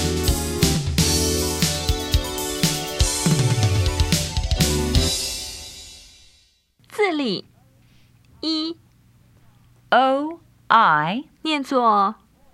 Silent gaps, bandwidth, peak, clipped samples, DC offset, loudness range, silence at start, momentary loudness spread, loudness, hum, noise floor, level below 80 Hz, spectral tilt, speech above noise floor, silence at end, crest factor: none; 16 kHz; 0 dBFS; under 0.1%; under 0.1%; 8 LU; 0 s; 13 LU; -21 LUFS; none; -59 dBFS; -32 dBFS; -4 dB/octave; 39 dB; 0.4 s; 22 dB